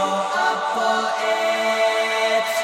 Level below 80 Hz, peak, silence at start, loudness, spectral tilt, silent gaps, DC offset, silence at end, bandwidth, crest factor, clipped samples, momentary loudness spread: -72 dBFS; -8 dBFS; 0 s; -20 LUFS; -1.5 dB/octave; none; under 0.1%; 0 s; 17 kHz; 12 dB; under 0.1%; 2 LU